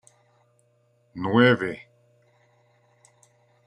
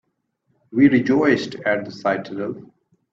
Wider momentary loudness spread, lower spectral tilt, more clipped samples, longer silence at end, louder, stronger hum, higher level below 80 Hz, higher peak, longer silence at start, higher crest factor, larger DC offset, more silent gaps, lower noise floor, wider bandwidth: first, 23 LU vs 13 LU; about the same, -7 dB/octave vs -7 dB/octave; neither; first, 1.9 s vs 0.5 s; about the same, -22 LUFS vs -20 LUFS; first, 60 Hz at -45 dBFS vs none; second, -70 dBFS vs -64 dBFS; about the same, -4 dBFS vs -2 dBFS; first, 1.15 s vs 0.7 s; first, 24 dB vs 18 dB; neither; neither; second, -65 dBFS vs -70 dBFS; first, 10.5 kHz vs 7.6 kHz